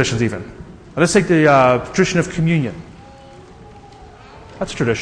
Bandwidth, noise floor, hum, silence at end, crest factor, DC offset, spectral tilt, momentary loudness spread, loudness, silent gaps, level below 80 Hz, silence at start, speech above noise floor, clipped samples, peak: 10.5 kHz; -40 dBFS; none; 0 s; 18 dB; under 0.1%; -5.5 dB/octave; 18 LU; -16 LUFS; none; -42 dBFS; 0 s; 25 dB; under 0.1%; 0 dBFS